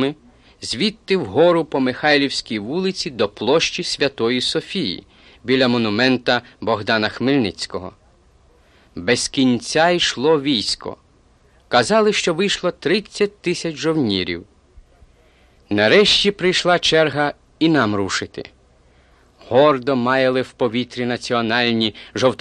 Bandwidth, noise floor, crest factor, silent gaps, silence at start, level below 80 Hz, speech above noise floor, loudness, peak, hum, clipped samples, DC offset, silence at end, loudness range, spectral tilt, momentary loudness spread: 11.5 kHz; -54 dBFS; 18 dB; none; 0 s; -50 dBFS; 36 dB; -18 LUFS; -2 dBFS; none; under 0.1%; under 0.1%; 0.05 s; 4 LU; -4 dB/octave; 9 LU